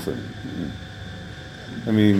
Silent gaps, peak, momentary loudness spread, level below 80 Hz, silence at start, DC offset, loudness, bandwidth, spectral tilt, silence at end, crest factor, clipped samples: none; -4 dBFS; 14 LU; -46 dBFS; 0 s; under 0.1%; -29 LUFS; 15 kHz; -7 dB/octave; 0 s; 20 dB; under 0.1%